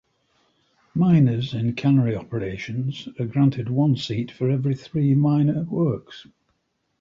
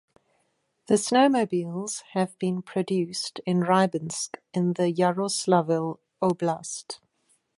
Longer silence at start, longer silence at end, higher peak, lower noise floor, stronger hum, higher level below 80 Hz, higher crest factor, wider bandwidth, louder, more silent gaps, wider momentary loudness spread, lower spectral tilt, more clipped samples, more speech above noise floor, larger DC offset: about the same, 0.95 s vs 0.9 s; first, 0.8 s vs 0.6 s; about the same, -8 dBFS vs -6 dBFS; about the same, -72 dBFS vs -72 dBFS; neither; first, -54 dBFS vs -72 dBFS; second, 14 dB vs 20 dB; second, 7.4 kHz vs 11.5 kHz; first, -22 LUFS vs -26 LUFS; neither; about the same, 11 LU vs 11 LU; first, -8.5 dB/octave vs -5 dB/octave; neither; first, 51 dB vs 47 dB; neither